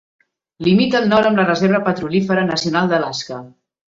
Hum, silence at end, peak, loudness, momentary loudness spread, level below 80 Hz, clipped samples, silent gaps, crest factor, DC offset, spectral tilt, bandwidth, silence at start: none; 0.45 s; -2 dBFS; -16 LUFS; 10 LU; -54 dBFS; under 0.1%; none; 16 dB; under 0.1%; -6 dB/octave; 7.6 kHz; 0.6 s